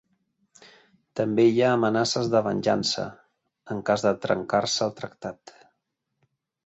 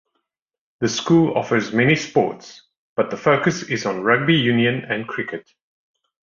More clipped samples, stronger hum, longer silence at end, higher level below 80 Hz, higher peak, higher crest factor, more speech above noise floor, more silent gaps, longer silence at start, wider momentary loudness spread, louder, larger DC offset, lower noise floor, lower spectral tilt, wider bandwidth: neither; neither; first, 1.35 s vs 1 s; second, -64 dBFS vs -58 dBFS; second, -8 dBFS vs -2 dBFS; about the same, 18 dB vs 18 dB; second, 55 dB vs 62 dB; second, none vs 2.77-2.96 s; first, 1.15 s vs 0.8 s; first, 15 LU vs 11 LU; second, -24 LUFS vs -19 LUFS; neither; about the same, -79 dBFS vs -81 dBFS; about the same, -4.5 dB/octave vs -5.5 dB/octave; first, 8.2 kHz vs 7.4 kHz